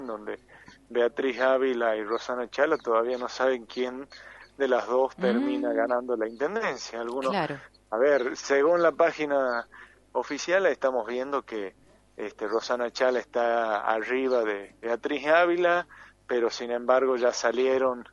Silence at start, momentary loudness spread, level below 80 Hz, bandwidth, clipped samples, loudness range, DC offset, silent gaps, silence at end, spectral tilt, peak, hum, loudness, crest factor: 0 s; 11 LU; -66 dBFS; 10.5 kHz; under 0.1%; 3 LU; under 0.1%; none; 0.1 s; -4 dB/octave; -8 dBFS; none; -27 LUFS; 18 dB